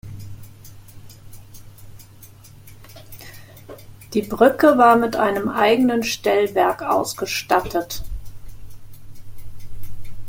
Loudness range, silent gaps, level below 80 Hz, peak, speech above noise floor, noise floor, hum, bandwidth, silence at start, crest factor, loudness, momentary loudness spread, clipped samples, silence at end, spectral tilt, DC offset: 9 LU; none; -42 dBFS; -2 dBFS; 26 dB; -44 dBFS; none; 17 kHz; 0.05 s; 20 dB; -18 LUFS; 27 LU; under 0.1%; 0 s; -4.5 dB/octave; under 0.1%